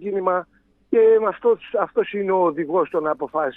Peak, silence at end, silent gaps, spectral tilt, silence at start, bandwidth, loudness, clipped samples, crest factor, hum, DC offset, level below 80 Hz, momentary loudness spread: -6 dBFS; 0.05 s; none; -9 dB/octave; 0 s; 3.8 kHz; -20 LUFS; under 0.1%; 14 dB; none; under 0.1%; -64 dBFS; 8 LU